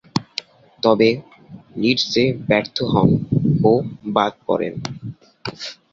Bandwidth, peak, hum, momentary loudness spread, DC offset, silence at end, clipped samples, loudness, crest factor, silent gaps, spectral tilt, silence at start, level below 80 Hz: 7.6 kHz; -2 dBFS; none; 16 LU; under 0.1%; 0.2 s; under 0.1%; -19 LUFS; 18 dB; none; -6.5 dB/octave; 0.15 s; -50 dBFS